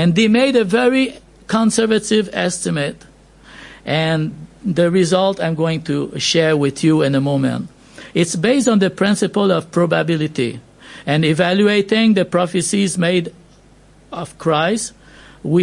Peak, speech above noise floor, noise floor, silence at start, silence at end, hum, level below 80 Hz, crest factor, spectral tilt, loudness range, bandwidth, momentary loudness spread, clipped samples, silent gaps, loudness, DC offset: -2 dBFS; 31 dB; -47 dBFS; 0 s; 0 s; none; -52 dBFS; 16 dB; -5 dB/octave; 3 LU; 11.5 kHz; 10 LU; under 0.1%; none; -16 LUFS; under 0.1%